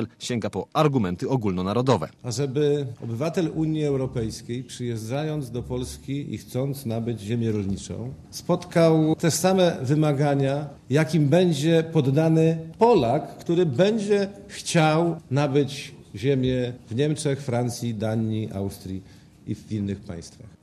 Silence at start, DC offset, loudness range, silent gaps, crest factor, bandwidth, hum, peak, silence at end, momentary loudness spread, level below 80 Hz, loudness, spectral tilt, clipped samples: 0 s; under 0.1%; 8 LU; none; 18 dB; 13.5 kHz; none; -6 dBFS; 0.15 s; 12 LU; -50 dBFS; -24 LUFS; -6.5 dB/octave; under 0.1%